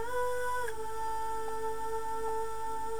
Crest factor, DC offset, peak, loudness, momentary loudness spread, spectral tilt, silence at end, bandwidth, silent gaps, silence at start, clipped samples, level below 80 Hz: 12 dB; 2%; -22 dBFS; -36 LUFS; 4 LU; -3 dB/octave; 0 s; over 20 kHz; none; 0 s; under 0.1%; -54 dBFS